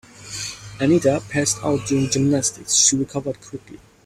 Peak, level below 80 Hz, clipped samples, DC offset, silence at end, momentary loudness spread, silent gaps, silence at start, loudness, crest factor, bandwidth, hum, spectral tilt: -2 dBFS; -52 dBFS; under 0.1%; under 0.1%; 0.3 s; 17 LU; none; 0.2 s; -19 LUFS; 18 dB; 16 kHz; none; -3.5 dB/octave